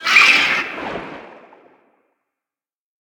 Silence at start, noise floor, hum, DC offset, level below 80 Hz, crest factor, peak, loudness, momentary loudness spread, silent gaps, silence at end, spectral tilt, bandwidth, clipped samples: 0 s; under -90 dBFS; none; under 0.1%; -60 dBFS; 20 dB; 0 dBFS; -12 LUFS; 21 LU; none; 1.75 s; -0.5 dB/octave; 19 kHz; under 0.1%